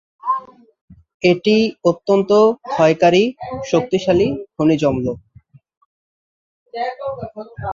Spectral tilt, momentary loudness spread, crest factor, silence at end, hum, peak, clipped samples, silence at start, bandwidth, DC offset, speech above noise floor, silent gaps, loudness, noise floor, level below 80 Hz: -6 dB/octave; 14 LU; 16 dB; 0 s; none; -2 dBFS; under 0.1%; 0.25 s; 7.6 kHz; under 0.1%; 32 dB; 0.81-0.88 s, 1.14-1.20 s, 5.77-6.66 s; -17 LUFS; -49 dBFS; -48 dBFS